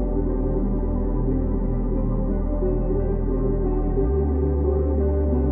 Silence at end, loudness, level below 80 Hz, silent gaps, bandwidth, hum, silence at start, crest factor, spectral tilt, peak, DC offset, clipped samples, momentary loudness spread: 0 s; -24 LUFS; -24 dBFS; none; 2.2 kHz; none; 0 s; 12 dB; -14.5 dB/octave; -10 dBFS; under 0.1%; under 0.1%; 3 LU